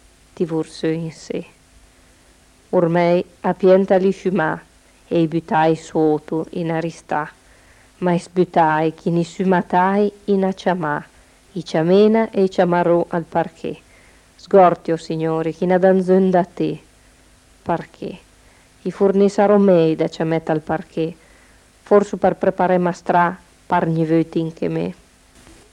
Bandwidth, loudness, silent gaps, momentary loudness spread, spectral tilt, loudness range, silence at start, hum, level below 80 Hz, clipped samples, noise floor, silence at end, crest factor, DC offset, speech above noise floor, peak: 11 kHz; -18 LUFS; none; 13 LU; -7.5 dB/octave; 4 LU; 0.4 s; none; -54 dBFS; under 0.1%; -51 dBFS; 0.8 s; 18 dB; under 0.1%; 34 dB; -2 dBFS